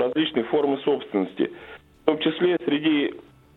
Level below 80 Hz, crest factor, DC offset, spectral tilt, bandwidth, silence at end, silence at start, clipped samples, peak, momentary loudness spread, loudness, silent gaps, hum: -64 dBFS; 20 dB; under 0.1%; -8 dB/octave; 4.2 kHz; 0.35 s; 0 s; under 0.1%; -4 dBFS; 7 LU; -24 LUFS; none; none